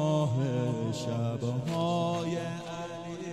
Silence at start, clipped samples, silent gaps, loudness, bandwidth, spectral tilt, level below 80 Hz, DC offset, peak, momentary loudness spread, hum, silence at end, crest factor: 0 s; under 0.1%; none; -32 LUFS; 12.5 kHz; -7 dB/octave; -66 dBFS; under 0.1%; -18 dBFS; 10 LU; none; 0 s; 14 dB